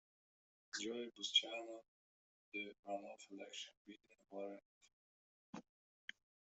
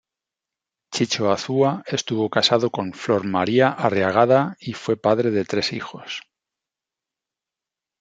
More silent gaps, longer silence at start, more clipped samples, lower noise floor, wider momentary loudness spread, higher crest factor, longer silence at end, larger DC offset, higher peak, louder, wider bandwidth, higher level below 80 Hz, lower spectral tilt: first, 1.88-2.52 s, 2.79-2.83 s, 3.77-3.85 s, 4.65-4.81 s, 4.93-5.53 s vs none; second, 0.75 s vs 0.9 s; neither; about the same, under -90 dBFS vs -88 dBFS; first, 22 LU vs 12 LU; first, 28 dB vs 20 dB; second, 0.95 s vs 1.8 s; neither; second, -22 dBFS vs -2 dBFS; second, -45 LUFS vs -21 LUFS; second, 8.2 kHz vs 9.2 kHz; second, under -90 dBFS vs -66 dBFS; second, -1 dB/octave vs -5 dB/octave